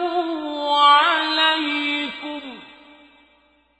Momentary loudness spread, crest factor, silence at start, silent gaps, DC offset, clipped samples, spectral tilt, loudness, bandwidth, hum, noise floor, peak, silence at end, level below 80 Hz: 18 LU; 18 dB; 0 s; none; under 0.1%; under 0.1%; -1.5 dB/octave; -18 LUFS; 8.6 kHz; none; -59 dBFS; -2 dBFS; 1.1 s; -68 dBFS